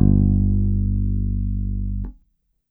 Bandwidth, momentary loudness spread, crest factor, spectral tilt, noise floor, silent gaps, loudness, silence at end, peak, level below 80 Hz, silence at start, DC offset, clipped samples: 1.1 kHz; 12 LU; 16 dB; -16 dB/octave; -65 dBFS; none; -22 LUFS; 0.6 s; -4 dBFS; -24 dBFS; 0 s; under 0.1%; under 0.1%